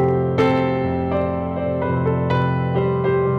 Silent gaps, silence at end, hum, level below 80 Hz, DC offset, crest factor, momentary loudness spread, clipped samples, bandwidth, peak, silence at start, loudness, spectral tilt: none; 0 s; none; -42 dBFS; under 0.1%; 12 dB; 5 LU; under 0.1%; 6.4 kHz; -8 dBFS; 0 s; -20 LUFS; -9 dB/octave